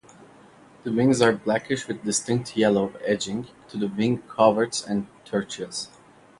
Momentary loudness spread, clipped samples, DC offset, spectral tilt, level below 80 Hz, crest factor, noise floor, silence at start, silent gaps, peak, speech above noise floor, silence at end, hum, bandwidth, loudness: 12 LU; under 0.1%; under 0.1%; -4.5 dB/octave; -62 dBFS; 22 dB; -51 dBFS; 0.85 s; none; -2 dBFS; 27 dB; 0.55 s; none; 11.5 kHz; -24 LUFS